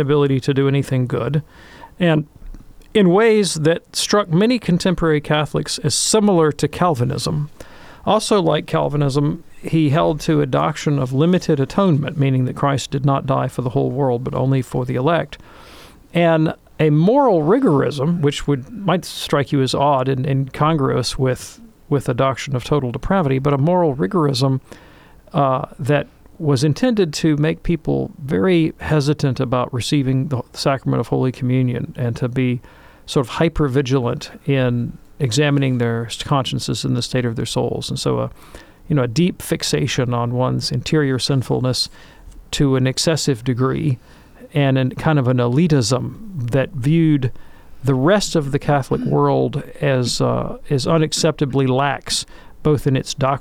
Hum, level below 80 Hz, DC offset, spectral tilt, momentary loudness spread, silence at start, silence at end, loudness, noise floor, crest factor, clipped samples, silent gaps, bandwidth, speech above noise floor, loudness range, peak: none; -40 dBFS; under 0.1%; -6 dB/octave; 7 LU; 0 s; 0 s; -18 LUFS; -44 dBFS; 14 dB; under 0.1%; none; 15.5 kHz; 27 dB; 3 LU; -4 dBFS